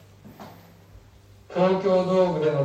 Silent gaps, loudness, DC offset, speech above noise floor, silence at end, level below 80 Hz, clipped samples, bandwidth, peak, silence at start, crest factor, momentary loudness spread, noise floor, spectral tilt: none; -22 LUFS; under 0.1%; 30 dB; 0 s; -58 dBFS; under 0.1%; 8.6 kHz; -8 dBFS; 0.25 s; 16 dB; 24 LU; -51 dBFS; -7.5 dB/octave